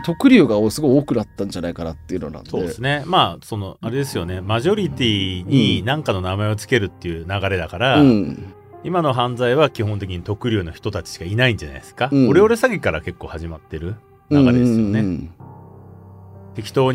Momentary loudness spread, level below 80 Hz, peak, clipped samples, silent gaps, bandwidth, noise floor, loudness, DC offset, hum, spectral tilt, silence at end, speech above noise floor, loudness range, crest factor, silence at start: 16 LU; -44 dBFS; 0 dBFS; under 0.1%; none; 15.5 kHz; -41 dBFS; -19 LUFS; under 0.1%; none; -6.5 dB/octave; 0 s; 22 dB; 3 LU; 18 dB; 0 s